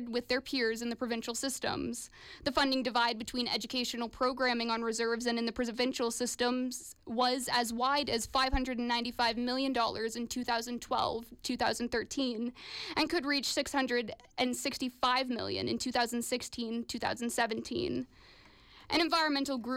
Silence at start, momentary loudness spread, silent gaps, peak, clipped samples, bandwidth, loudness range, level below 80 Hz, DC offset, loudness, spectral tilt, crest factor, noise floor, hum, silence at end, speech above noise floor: 0 s; 7 LU; none; -18 dBFS; under 0.1%; 16.5 kHz; 2 LU; -54 dBFS; under 0.1%; -33 LUFS; -2.5 dB/octave; 16 dB; -58 dBFS; none; 0 s; 25 dB